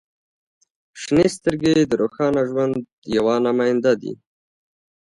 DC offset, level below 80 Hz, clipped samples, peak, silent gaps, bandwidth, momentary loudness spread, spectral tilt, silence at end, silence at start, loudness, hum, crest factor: under 0.1%; -54 dBFS; under 0.1%; -4 dBFS; 2.92-3.02 s; 11.5 kHz; 9 LU; -6 dB/octave; 0.9 s; 0.95 s; -20 LUFS; none; 16 dB